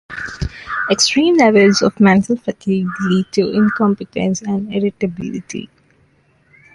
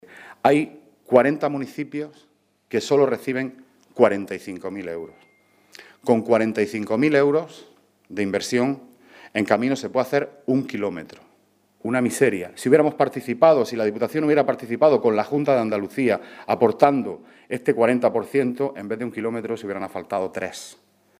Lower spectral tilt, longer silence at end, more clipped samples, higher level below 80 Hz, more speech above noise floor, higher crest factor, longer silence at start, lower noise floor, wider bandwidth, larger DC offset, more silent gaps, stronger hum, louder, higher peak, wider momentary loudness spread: about the same, -5 dB/octave vs -6 dB/octave; first, 1.1 s vs 0.45 s; neither; first, -42 dBFS vs -70 dBFS; about the same, 41 dB vs 40 dB; second, 14 dB vs 22 dB; about the same, 0.1 s vs 0.15 s; second, -55 dBFS vs -61 dBFS; second, 11.5 kHz vs 15.5 kHz; neither; neither; second, none vs 50 Hz at -60 dBFS; first, -15 LUFS vs -22 LUFS; about the same, -2 dBFS vs 0 dBFS; about the same, 15 LU vs 14 LU